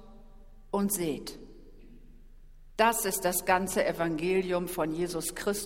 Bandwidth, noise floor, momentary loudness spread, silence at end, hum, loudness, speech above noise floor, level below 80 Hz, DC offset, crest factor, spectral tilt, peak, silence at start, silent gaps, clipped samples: 16.5 kHz; -51 dBFS; 10 LU; 0 s; none; -29 LUFS; 21 dB; -52 dBFS; under 0.1%; 22 dB; -4 dB/octave; -8 dBFS; 0 s; none; under 0.1%